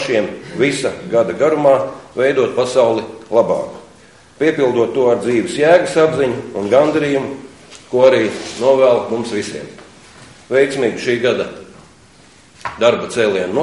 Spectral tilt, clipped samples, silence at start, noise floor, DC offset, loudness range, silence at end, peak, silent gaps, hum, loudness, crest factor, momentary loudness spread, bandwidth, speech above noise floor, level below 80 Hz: -5 dB/octave; under 0.1%; 0 s; -46 dBFS; 0.2%; 4 LU; 0 s; 0 dBFS; none; none; -15 LUFS; 16 dB; 12 LU; 11.5 kHz; 31 dB; -54 dBFS